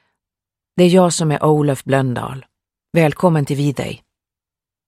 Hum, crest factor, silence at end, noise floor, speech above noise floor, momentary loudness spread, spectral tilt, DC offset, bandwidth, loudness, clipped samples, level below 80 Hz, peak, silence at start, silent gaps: none; 18 dB; 0.9 s; -88 dBFS; 73 dB; 15 LU; -6 dB/octave; under 0.1%; 15 kHz; -16 LUFS; under 0.1%; -54 dBFS; 0 dBFS; 0.75 s; none